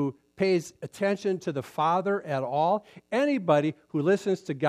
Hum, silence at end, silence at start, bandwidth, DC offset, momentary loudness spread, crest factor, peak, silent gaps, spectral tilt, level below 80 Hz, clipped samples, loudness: none; 0 s; 0 s; 14 kHz; under 0.1%; 7 LU; 18 dB; -10 dBFS; none; -6.5 dB/octave; -74 dBFS; under 0.1%; -27 LUFS